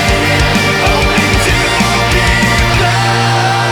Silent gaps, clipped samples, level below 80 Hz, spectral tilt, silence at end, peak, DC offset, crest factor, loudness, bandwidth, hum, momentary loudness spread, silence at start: none; under 0.1%; -20 dBFS; -4 dB/octave; 0 s; 0 dBFS; under 0.1%; 10 dB; -10 LUFS; 18 kHz; none; 1 LU; 0 s